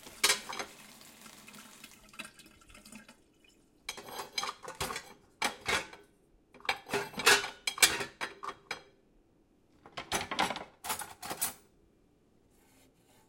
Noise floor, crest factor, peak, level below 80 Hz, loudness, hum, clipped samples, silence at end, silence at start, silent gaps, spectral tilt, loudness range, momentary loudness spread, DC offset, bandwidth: -67 dBFS; 32 dB; -6 dBFS; -66 dBFS; -32 LUFS; none; under 0.1%; 1.7 s; 0 s; none; -0.5 dB/octave; 14 LU; 25 LU; under 0.1%; 16.5 kHz